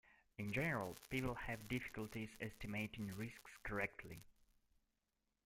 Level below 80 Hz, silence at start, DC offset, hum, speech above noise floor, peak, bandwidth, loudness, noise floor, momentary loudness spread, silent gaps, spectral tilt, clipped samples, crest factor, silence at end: -64 dBFS; 0.05 s; under 0.1%; none; 42 dB; -28 dBFS; 16.5 kHz; -46 LUFS; -88 dBFS; 11 LU; none; -5.5 dB/octave; under 0.1%; 20 dB; 1.15 s